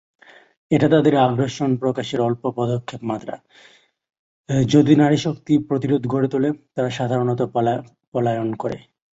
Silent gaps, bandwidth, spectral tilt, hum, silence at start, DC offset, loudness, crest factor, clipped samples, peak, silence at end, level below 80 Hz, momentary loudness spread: 4.19-4.44 s, 8.07-8.12 s; 8 kHz; -7 dB/octave; none; 0.7 s; under 0.1%; -20 LUFS; 18 dB; under 0.1%; -2 dBFS; 0.4 s; -56 dBFS; 13 LU